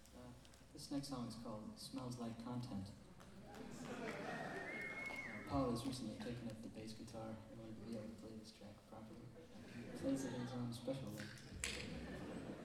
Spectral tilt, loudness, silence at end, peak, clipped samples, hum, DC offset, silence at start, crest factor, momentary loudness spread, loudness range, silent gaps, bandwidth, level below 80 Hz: -5 dB/octave; -49 LUFS; 0 s; -24 dBFS; under 0.1%; none; under 0.1%; 0 s; 24 dB; 14 LU; 6 LU; none; 16.5 kHz; -66 dBFS